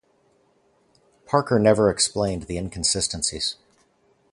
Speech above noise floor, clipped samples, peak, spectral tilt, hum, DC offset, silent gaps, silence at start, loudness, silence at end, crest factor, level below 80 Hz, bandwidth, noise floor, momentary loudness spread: 41 dB; under 0.1%; -4 dBFS; -3.5 dB/octave; none; under 0.1%; none; 1.3 s; -22 LUFS; 0.8 s; 22 dB; -46 dBFS; 11.5 kHz; -63 dBFS; 10 LU